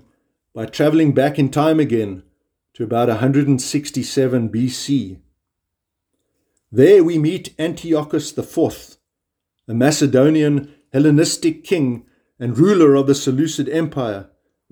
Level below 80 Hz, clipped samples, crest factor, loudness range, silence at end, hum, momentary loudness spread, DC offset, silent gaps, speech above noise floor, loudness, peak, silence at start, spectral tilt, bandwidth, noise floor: -56 dBFS; under 0.1%; 18 dB; 4 LU; 0.5 s; none; 13 LU; under 0.1%; none; 64 dB; -17 LUFS; 0 dBFS; 0.55 s; -6 dB/octave; 20 kHz; -80 dBFS